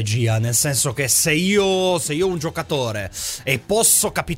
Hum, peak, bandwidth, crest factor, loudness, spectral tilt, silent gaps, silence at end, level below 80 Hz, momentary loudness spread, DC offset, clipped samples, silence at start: none; -2 dBFS; 16.5 kHz; 16 dB; -18 LUFS; -3.5 dB/octave; none; 0 s; -46 dBFS; 11 LU; under 0.1%; under 0.1%; 0 s